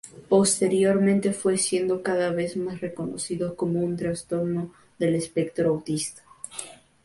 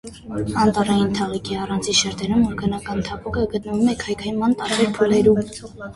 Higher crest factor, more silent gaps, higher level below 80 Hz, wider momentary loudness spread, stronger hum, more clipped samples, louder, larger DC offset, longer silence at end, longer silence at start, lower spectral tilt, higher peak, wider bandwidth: about the same, 18 dB vs 18 dB; neither; second, -60 dBFS vs -42 dBFS; first, 14 LU vs 9 LU; neither; neither; second, -25 LUFS vs -20 LUFS; neither; first, 0.3 s vs 0 s; about the same, 0.05 s vs 0.05 s; about the same, -5 dB/octave vs -4.5 dB/octave; second, -8 dBFS vs -4 dBFS; about the same, 12 kHz vs 11.5 kHz